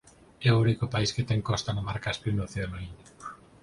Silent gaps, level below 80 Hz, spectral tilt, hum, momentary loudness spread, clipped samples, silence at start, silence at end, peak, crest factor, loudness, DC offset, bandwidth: none; -48 dBFS; -5.5 dB/octave; none; 20 LU; under 0.1%; 0.4 s; 0.25 s; -10 dBFS; 18 dB; -28 LUFS; under 0.1%; 11 kHz